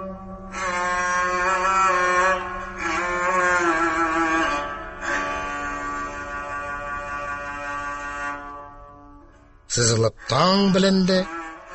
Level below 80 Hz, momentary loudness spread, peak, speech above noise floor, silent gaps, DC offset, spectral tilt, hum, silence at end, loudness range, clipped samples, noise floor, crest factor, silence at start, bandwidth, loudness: -46 dBFS; 13 LU; -6 dBFS; 31 dB; none; under 0.1%; -4 dB/octave; none; 0 s; 9 LU; under 0.1%; -49 dBFS; 16 dB; 0 s; 8.6 kHz; -22 LUFS